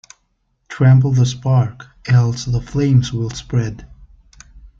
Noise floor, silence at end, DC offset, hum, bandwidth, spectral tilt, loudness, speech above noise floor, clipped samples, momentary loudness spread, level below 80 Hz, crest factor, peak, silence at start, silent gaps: -66 dBFS; 0.15 s; under 0.1%; none; 7.6 kHz; -7 dB/octave; -16 LUFS; 50 dB; under 0.1%; 14 LU; -40 dBFS; 14 dB; -2 dBFS; 0.7 s; none